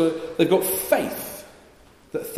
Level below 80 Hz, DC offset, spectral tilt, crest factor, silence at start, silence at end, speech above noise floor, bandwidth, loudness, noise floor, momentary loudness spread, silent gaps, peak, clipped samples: -58 dBFS; under 0.1%; -4 dB/octave; 20 dB; 0 s; 0 s; 30 dB; 15.5 kHz; -23 LUFS; -52 dBFS; 15 LU; none; -6 dBFS; under 0.1%